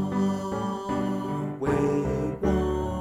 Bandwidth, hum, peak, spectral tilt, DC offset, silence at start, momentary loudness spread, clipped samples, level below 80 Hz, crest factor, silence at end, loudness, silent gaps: 14.5 kHz; none; -12 dBFS; -7.5 dB/octave; under 0.1%; 0 s; 5 LU; under 0.1%; -40 dBFS; 14 dB; 0 s; -27 LUFS; none